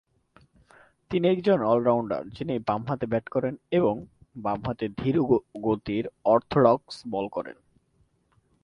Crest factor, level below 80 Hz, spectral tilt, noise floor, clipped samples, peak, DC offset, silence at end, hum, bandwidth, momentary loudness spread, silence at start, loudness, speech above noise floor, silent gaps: 22 dB; -56 dBFS; -8.5 dB/octave; -67 dBFS; under 0.1%; -4 dBFS; under 0.1%; 1.1 s; none; 10.5 kHz; 10 LU; 1.1 s; -26 LUFS; 42 dB; none